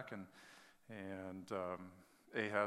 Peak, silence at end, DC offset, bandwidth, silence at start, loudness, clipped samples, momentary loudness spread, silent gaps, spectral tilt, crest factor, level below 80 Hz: -20 dBFS; 0 s; under 0.1%; 16 kHz; 0 s; -47 LUFS; under 0.1%; 18 LU; none; -5.5 dB/octave; 26 dB; -88 dBFS